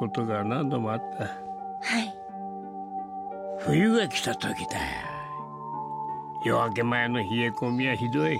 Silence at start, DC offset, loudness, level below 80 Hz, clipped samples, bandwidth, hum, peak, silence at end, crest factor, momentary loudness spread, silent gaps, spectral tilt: 0 s; under 0.1%; -29 LUFS; -58 dBFS; under 0.1%; 15.5 kHz; none; -12 dBFS; 0 s; 18 dB; 12 LU; none; -5.5 dB/octave